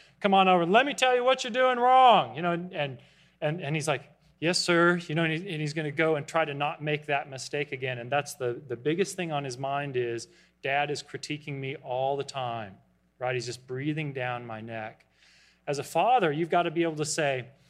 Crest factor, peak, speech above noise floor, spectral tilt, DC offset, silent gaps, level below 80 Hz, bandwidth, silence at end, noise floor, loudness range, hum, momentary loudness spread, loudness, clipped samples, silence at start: 20 dB; -6 dBFS; 33 dB; -4.5 dB/octave; under 0.1%; none; -72 dBFS; 14.5 kHz; 0.2 s; -61 dBFS; 9 LU; none; 14 LU; -27 LUFS; under 0.1%; 0.2 s